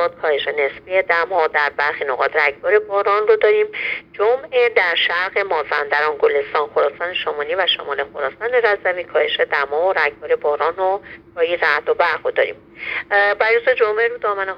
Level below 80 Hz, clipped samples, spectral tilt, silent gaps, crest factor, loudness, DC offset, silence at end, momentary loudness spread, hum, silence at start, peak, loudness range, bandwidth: -60 dBFS; under 0.1%; -4 dB/octave; none; 18 dB; -18 LUFS; under 0.1%; 0 s; 7 LU; none; 0 s; -2 dBFS; 2 LU; 6.4 kHz